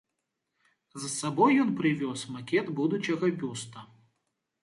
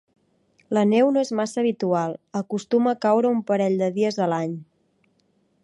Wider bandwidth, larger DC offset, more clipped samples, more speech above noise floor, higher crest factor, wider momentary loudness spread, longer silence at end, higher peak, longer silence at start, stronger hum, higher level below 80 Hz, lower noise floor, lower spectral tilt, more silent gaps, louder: about the same, 11.5 kHz vs 11.5 kHz; neither; neither; first, 55 dB vs 44 dB; about the same, 20 dB vs 16 dB; first, 16 LU vs 9 LU; second, 0.8 s vs 1 s; second, -12 dBFS vs -8 dBFS; first, 0.95 s vs 0.7 s; neither; about the same, -76 dBFS vs -74 dBFS; first, -83 dBFS vs -66 dBFS; second, -5 dB/octave vs -6.5 dB/octave; neither; second, -28 LUFS vs -22 LUFS